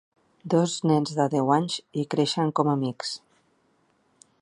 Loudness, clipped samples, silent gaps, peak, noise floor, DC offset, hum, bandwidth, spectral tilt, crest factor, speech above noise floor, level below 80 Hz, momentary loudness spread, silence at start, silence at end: -25 LUFS; under 0.1%; none; -6 dBFS; -67 dBFS; under 0.1%; none; 11.5 kHz; -5.5 dB/octave; 20 dB; 42 dB; -72 dBFS; 10 LU; 0.45 s; 1.25 s